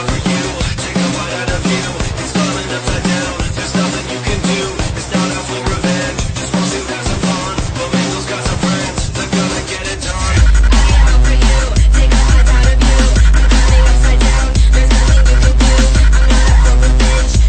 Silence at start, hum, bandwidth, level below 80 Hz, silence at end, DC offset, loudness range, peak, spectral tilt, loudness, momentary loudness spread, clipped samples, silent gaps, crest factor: 0 s; none; 9.4 kHz; -12 dBFS; 0 s; under 0.1%; 6 LU; 0 dBFS; -4.5 dB/octave; -14 LUFS; 7 LU; under 0.1%; none; 10 dB